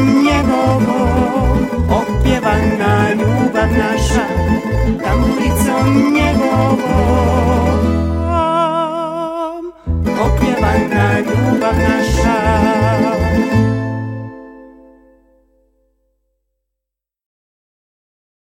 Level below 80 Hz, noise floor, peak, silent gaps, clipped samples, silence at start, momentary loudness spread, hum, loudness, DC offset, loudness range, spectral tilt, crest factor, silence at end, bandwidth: -24 dBFS; -82 dBFS; 0 dBFS; none; under 0.1%; 0 s; 7 LU; none; -14 LUFS; under 0.1%; 4 LU; -6.5 dB/octave; 14 dB; 3.75 s; 16.5 kHz